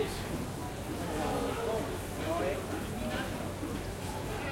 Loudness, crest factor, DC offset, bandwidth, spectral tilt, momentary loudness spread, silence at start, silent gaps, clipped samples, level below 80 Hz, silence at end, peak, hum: -36 LUFS; 16 dB; under 0.1%; 16.5 kHz; -5 dB/octave; 5 LU; 0 s; none; under 0.1%; -46 dBFS; 0 s; -20 dBFS; none